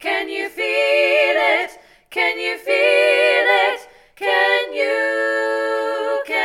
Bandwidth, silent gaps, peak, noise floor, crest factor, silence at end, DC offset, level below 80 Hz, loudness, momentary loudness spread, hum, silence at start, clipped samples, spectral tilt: 15.5 kHz; none; -4 dBFS; -42 dBFS; 16 dB; 0 s; under 0.1%; -64 dBFS; -17 LUFS; 9 LU; none; 0 s; under 0.1%; -0.5 dB/octave